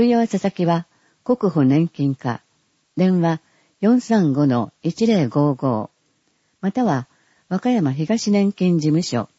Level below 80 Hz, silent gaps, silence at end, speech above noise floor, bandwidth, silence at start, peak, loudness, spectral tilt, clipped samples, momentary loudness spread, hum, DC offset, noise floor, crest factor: -64 dBFS; none; 0.15 s; 47 dB; 8 kHz; 0 s; -6 dBFS; -20 LUFS; -7 dB/octave; under 0.1%; 10 LU; none; under 0.1%; -65 dBFS; 14 dB